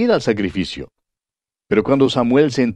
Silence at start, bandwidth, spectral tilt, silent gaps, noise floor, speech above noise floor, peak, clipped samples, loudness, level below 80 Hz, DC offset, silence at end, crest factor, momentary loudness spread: 0 s; 9.6 kHz; -6 dB/octave; none; -90 dBFS; 74 dB; -2 dBFS; under 0.1%; -17 LUFS; -48 dBFS; under 0.1%; 0 s; 16 dB; 10 LU